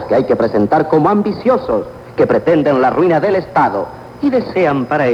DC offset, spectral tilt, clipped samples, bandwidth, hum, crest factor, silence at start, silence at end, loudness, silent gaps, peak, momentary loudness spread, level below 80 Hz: under 0.1%; -8.5 dB/octave; under 0.1%; 8.4 kHz; none; 12 dB; 0 s; 0 s; -14 LUFS; none; -2 dBFS; 7 LU; -46 dBFS